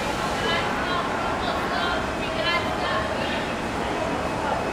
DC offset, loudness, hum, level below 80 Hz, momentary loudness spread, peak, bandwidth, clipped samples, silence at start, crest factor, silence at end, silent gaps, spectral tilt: under 0.1%; -25 LUFS; none; -42 dBFS; 3 LU; -10 dBFS; 18 kHz; under 0.1%; 0 s; 14 dB; 0 s; none; -4.5 dB/octave